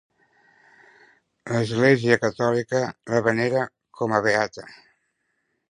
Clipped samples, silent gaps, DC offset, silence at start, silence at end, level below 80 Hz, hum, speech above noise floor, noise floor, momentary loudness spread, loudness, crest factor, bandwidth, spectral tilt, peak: under 0.1%; none; under 0.1%; 1.45 s; 1 s; -62 dBFS; none; 52 dB; -74 dBFS; 11 LU; -22 LUFS; 22 dB; 11 kHz; -6 dB/octave; -2 dBFS